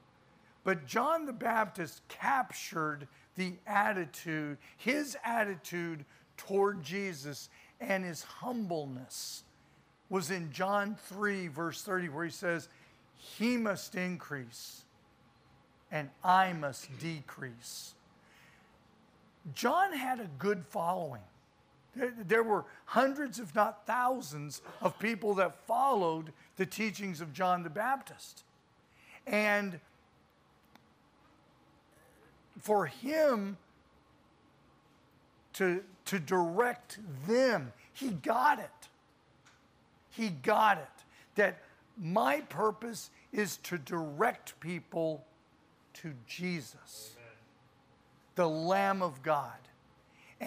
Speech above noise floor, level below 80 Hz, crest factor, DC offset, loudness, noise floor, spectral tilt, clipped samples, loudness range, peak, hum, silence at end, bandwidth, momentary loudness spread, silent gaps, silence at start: 33 dB; -78 dBFS; 22 dB; under 0.1%; -34 LUFS; -67 dBFS; -5 dB/octave; under 0.1%; 6 LU; -12 dBFS; none; 0 s; 15.5 kHz; 17 LU; none; 0.65 s